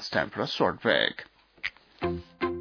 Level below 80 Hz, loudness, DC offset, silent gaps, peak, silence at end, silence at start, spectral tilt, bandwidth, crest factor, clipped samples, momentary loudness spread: -56 dBFS; -29 LUFS; under 0.1%; none; -6 dBFS; 0 s; 0 s; -5 dB/octave; 5.4 kHz; 24 dB; under 0.1%; 12 LU